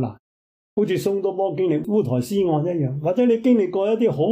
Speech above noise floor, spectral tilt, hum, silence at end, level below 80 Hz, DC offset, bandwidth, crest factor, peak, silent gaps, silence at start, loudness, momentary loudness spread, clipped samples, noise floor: over 70 dB; -8 dB/octave; none; 0 s; -60 dBFS; under 0.1%; 15.5 kHz; 12 dB; -8 dBFS; 0.19-0.77 s; 0 s; -21 LUFS; 5 LU; under 0.1%; under -90 dBFS